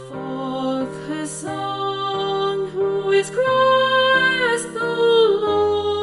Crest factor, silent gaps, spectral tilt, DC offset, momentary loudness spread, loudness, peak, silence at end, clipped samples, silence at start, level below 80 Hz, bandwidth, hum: 12 dB; none; -3.5 dB/octave; under 0.1%; 12 LU; -19 LUFS; -6 dBFS; 0 s; under 0.1%; 0 s; -56 dBFS; 11.5 kHz; none